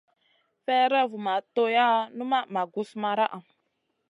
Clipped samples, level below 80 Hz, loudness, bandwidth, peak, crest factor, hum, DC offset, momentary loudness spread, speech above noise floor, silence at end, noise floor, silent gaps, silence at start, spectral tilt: under 0.1%; -86 dBFS; -26 LUFS; 11 kHz; -10 dBFS; 18 dB; none; under 0.1%; 9 LU; 51 dB; 0.7 s; -76 dBFS; none; 0.7 s; -5.5 dB/octave